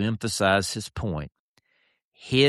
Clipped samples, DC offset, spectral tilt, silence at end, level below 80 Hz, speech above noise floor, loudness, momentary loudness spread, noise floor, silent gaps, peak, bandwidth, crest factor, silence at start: under 0.1%; under 0.1%; -4.5 dB/octave; 0 s; -48 dBFS; 45 dB; -26 LUFS; 17 LU; -70 dBFS; 1.39-1.56 s, 2.04-2.12 s; -8 dBFS; 13 kHz; 18 dB; 0 s